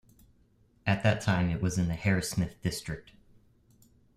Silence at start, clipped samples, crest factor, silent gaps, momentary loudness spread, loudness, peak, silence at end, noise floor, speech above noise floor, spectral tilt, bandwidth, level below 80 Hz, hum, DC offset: 0.85 s; under 0.1%; 22 dB; none; 10 LU; -30 LUFS; -10 dBFS; 1.15 s; -65 dBFS; 36 dB; -5.5 dB/octave; 15 kHz; -52 dBFS; none; under 0.1%